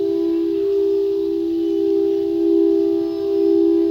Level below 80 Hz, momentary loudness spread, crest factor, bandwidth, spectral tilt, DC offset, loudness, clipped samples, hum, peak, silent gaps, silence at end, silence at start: -54 dBFS; 5 LU; 10 dB; 6 kHz; -7.5 dB/octave; under 0.1%; -18 LUFS; under 0.1%; none; -8 dBFS; none; 0 s; 0 s